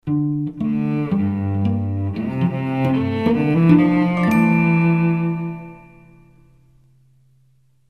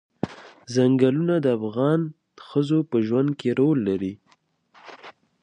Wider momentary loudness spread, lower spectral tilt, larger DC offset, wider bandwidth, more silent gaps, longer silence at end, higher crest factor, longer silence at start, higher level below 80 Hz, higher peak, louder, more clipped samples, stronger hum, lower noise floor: second, 9 LU vs 13 LU; about the same, -9 dB/octave vs -8 dB/octave; first, 0.1% vs under 0.1%; first, 13.5 kHz vs 9.8 kHz; neither; first, 2.1 s vs 0.3 s; about the same, 18 dB vs 18 dB; second, 0.05 s vs 0.25 s; first, -52 dBFS vs -62 dBFS; first, -2 dBFS vs -6 dBFS; first, -19 LUFS vs -23 LUFS; neither; neither; second, -59 dBFS vs -63 dBFS